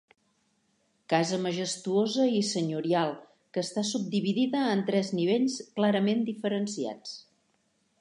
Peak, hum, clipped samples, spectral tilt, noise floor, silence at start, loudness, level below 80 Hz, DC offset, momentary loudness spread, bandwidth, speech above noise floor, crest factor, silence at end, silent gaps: -10 dBFS; none; under 0.1%; -5 dB/octave; -72 dBFS; 1.1 s; -28 LUFS; -80 dBFS; under 0.1%; 9 LU; 11 kHz; 44 dB; 20 dB; 0.8 s; none